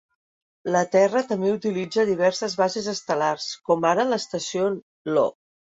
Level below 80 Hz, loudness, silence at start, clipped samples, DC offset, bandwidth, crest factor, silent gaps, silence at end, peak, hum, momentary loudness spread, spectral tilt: -68 dBFS; -23 LUFS; 0.65 s; under 0.1%; under 0.1%; 8 kHz; 18 dB; 4.83-5.05 s; 0.45 s; -6 dBFS; none; 7 LU; -4.5 dB/octave